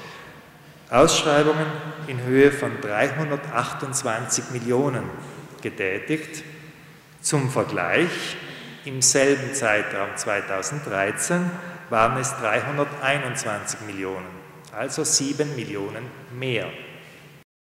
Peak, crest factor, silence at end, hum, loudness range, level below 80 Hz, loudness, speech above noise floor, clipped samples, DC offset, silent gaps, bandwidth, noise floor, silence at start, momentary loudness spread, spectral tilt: -2 dBFS; 22 dB; 0.25 s; none; 6 LU; -58 dBFS; -23 LUFS; 24 dB; under 0.1%; under 0.1%; none; 16 kHz; -47 dBFS; 0 s; 18 LU; -3.5 dB/octave